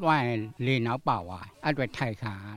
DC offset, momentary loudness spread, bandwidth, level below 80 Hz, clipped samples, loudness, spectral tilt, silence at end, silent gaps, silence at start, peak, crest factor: under 0.1%; 7 LU; 13 kHz; -58 dBFS; under 0.1%; -29 LUFS; -7 dB/octave; 0 s; none; 0 s; -10 dBFS; 18 dB